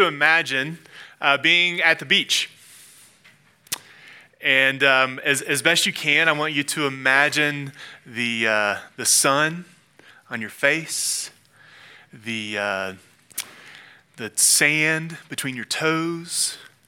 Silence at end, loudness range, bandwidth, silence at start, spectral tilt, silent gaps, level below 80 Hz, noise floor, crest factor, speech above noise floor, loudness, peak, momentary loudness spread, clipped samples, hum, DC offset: 0.25 s; 7 LU; 18 kHz; 0 s; -1.5 dB/octave; none; -78 dBFS; -55 dBFS; 22 dB; 33 dB; -19 LUFS; -2 dBFS; 16 LU; under 0.1%; none; under 0.1%